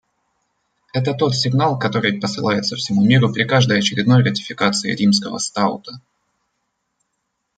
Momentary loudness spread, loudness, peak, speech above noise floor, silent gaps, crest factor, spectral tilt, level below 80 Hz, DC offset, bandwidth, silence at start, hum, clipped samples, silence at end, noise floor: 7 LU; -17 LUFS; -2 dBFS; 56 dB; none; 18 dB; -5 dB/octave; -58 dBFS; under 0.1%; 9.2 kHz; 0.95 s; none; under 0.1%; 1.6 s; -74 dBFS